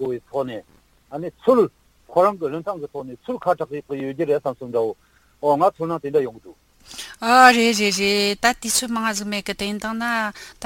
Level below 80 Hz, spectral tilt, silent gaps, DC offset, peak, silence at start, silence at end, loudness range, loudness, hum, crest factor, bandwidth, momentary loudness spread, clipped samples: -56 dBFS; -3 dB/octave; none; under 0.1%; 0 dBFS; 0 s; 0 s; 6 LU; -20 LUFS; none; 22 dB; 17 kHz; 14 LU; under 0.1%